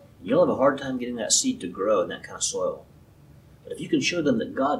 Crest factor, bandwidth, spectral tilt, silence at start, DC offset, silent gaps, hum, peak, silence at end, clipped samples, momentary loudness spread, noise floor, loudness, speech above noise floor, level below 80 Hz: 20 dB; 14 kHz; -3 dB/octave; 0.2 s; under 0.1%; none; none; -6 dBFS; 0 s; under 0.1%; 10 LU; -51 dBFS; -24 LUFS; 27 dB; -58 dBFS